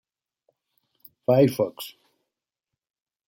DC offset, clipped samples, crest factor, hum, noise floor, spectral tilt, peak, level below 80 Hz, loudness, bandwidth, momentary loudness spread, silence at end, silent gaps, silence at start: under 0.1%; under 0.1%; 20 dB; none; -87 dBFS; -7 dB/octave; -8 dBFS; -68 dBFS; -23 LUFS; 16.5 kHz; 19 LU; 1.35 s; none; 1.3 s